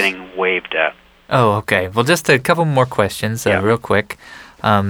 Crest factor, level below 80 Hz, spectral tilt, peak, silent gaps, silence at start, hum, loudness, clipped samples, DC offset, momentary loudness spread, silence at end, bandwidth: 16 dB; -50 dBFS; -5 dB/octave; 0 dBFS; none; 0 s; none; -16 LUFS; under 0.1%; under 0.1%; 6 LU; 0 s; over 20 kHz